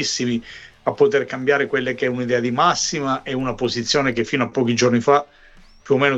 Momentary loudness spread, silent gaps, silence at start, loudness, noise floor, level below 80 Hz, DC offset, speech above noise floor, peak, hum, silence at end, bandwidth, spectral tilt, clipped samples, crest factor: 7 LU; none; 0 s; -20 LUFS; -46 dBFS; -50 dBFS; under 0.1%; 27 dB; -4 dBFS; none; 0 s; 8.2 kHz; -4 dB/octave; under 0.1%; 16 dB